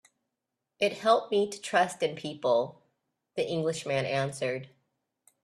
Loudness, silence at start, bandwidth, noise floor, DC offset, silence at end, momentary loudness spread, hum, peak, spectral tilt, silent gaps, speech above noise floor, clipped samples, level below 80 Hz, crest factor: -29 LUFS; 0.8 s; 13 kHz; -86 dBFS; under 0.1%; 0.75 s; 9 LU; none; -10 dBFS; -4.5 dB/octave; none; 57 dB; under 0.1%; -74 dBFS; 20 dB